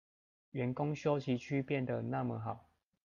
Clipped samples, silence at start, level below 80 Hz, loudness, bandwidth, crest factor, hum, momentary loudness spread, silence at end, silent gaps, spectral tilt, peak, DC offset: under 0.1%; 0.55 s; -72 dBFS; -37 LUFS; 7.2 kHz; 18 dB; none; 10 LU; 0.45 s; none; -8 dB/octave; -20 dBFS; under 0.1%